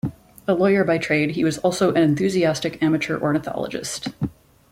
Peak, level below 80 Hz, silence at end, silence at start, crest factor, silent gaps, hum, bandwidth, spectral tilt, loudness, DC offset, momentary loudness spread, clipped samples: -6 dBFS; -52 dBFS; 0.4 s; 0.05 s; 16 dB; none; none; 16 kHz; -5.5 dB/octave; -21 LUFS; under 0.1%; 11 LU; under 0.1%